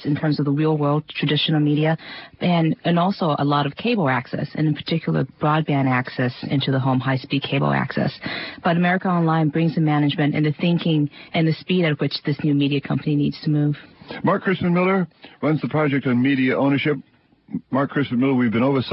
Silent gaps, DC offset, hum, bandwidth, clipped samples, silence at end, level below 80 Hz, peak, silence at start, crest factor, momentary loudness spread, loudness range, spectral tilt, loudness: none; under 0.1%; none; 5.8 kHz; under 0.1%; 0 s; -58 dBFS; -6 dBFS; 0 s; 14 dB; 6 LU; 1 LU; -11.5 dB/octave; -21 LUFS